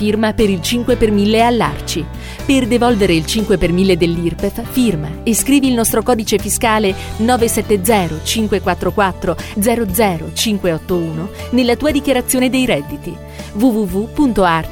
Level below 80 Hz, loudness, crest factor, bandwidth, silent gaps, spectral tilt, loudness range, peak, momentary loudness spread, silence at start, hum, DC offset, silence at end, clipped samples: -30 dBFS; -15 LUFS; 14 dB; 19 kHz; none; -4.5 dB/octave; 2 LU; 0 dBFS; 8 LU; 0 s; none; under 0.1%; 0 s; under 0.1%